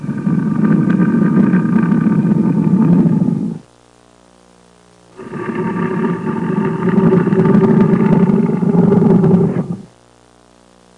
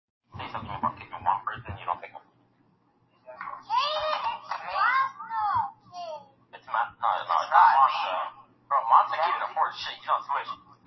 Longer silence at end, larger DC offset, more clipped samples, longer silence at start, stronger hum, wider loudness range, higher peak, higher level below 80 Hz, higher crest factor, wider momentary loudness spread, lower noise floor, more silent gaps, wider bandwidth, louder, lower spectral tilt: first, 1.15 s vs 0.3 s; neither; neither; second, 0 s vs 0.35 s; first, 60 Hz at -40 dBFS vs none; about the same, 9 LU vs 10 LU; first, -2 dBFS vs -6 dBFS; first, -48 dBFS vs -62 dBFS; second, 10 dB vs 22 dB; second, 10 LU vs 18 LU; second, -47 dBFS vs -66 dBFS; neither; second, 4.5 kHz vs 6 kHz; first, -13 LUFS vs -26 LUFS; first, -10.5 dB/octave vs -3.5 dB/octave